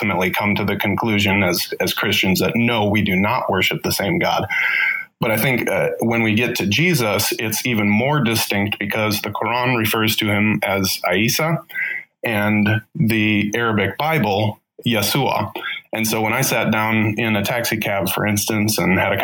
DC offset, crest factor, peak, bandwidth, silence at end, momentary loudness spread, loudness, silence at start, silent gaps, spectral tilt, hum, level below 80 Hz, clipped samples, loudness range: under 0.1%; 14 dB; -4 dBFS; 19 kHz; 0 s; 4 LU; -18 LUFS; 0 s; none; -4.5 dB/octave; none; -54 dBFS; under 0.1%; 2 LU